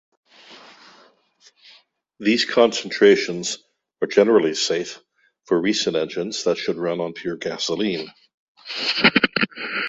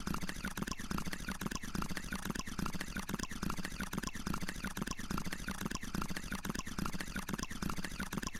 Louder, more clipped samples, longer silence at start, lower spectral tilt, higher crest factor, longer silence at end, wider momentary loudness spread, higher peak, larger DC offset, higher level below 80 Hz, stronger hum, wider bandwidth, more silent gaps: first, -20 LUFS vs -41 LUFS; neither; first, 0.5 s vs 0 s; about the same, -3.5 dB/octave vs -4 dB/octave; first, 22 dB vs 16 dB; about the same, 0 s vs 0 s; first, 12 LU vs 1 LU; first, 0 dBFS vs -24 dBFS; neither; second, -64 dBFS vs -48 dBFS; neither; second, 8 kHz vs 17 kHz; first, 8.34-8.55 s vs none